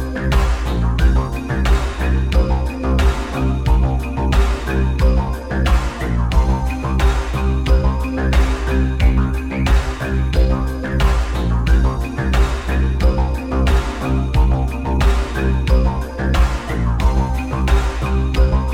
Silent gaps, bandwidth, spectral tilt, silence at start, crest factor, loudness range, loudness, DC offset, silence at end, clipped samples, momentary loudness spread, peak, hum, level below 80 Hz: none; 11.5 kHz; -6.5 dB/octave; 0 s; 12 dB; 1 LU; -18 LUFS; under 0.1%; 0 s; under 0.1%; 4 LU; -2 dBFS; none; -16 dBFS